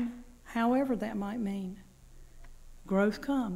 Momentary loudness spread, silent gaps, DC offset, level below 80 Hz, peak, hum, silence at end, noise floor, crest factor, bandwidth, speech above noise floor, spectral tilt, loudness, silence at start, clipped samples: 13 LU; none; under 0.1%; -52 dBFS; -18 dBFS; none; 0 s; -53 dBFS; 14 dB; 16 kHz; 22 dB; -7 dB/octave; -32 LUFS; 0 s; under 0.1%